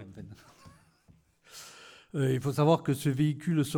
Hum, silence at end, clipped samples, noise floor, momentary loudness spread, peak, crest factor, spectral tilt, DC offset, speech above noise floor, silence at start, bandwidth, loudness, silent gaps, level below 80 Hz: none; 0 s; under 0.1%; -63 dBFS; 23 LU; -12 dBFS; 18 dB; -7 dB/octave; under 0.1%; 36 dB; 0 s; 18 kHz; -28 LUFS; none; -66 dBFS